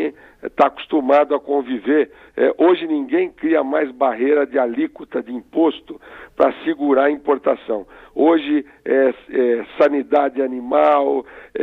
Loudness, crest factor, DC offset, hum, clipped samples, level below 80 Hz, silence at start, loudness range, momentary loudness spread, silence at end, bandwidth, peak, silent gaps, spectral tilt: -18 LUFS; 16 dB; under 0.1%; none; under 0.1%; -58 dBFS; 0 s; 2 LU; 11 LU; 0 s; 5.2 kHz; -2 dBFS; none; -7 dB/octave